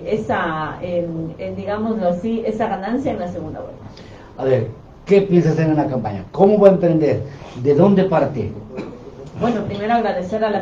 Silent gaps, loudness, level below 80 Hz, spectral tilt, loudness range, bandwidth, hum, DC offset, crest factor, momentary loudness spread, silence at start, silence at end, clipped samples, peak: none; -18 LUFS; -46 dBFS; -8.5 dB/octave; 7 LU; 7.6 kHz; none; under 0.1%; 18 dB; 18 LU; 0 s; 0 s; under 0.1%; 0 dBFS